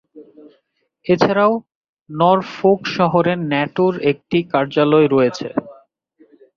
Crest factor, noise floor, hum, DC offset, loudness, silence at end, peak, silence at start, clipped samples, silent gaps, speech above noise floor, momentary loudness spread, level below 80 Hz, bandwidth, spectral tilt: 16 dB; -65 dBFS; none; under 0.1%; -17 LUFS; 0.85 s; -2 dBFS; 0.15 s; under 0.1%; 1.75-1.82 s, 1.89-1.95 s, 2.01-2.06 s; 49 dB; 11 LU; -60 dBFS; 7.2 kHz; -7 dB/octave